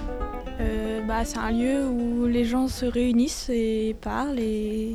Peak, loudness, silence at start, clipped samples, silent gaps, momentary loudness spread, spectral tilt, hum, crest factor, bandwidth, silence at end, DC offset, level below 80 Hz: -12 dBFS; -26 LUFS; 0 s; under 0.1%; none; 6 LU; -5.5 dB/octave; none; 14 dB; 14 kHz; 0 s; under 0.1%; -36 dBFS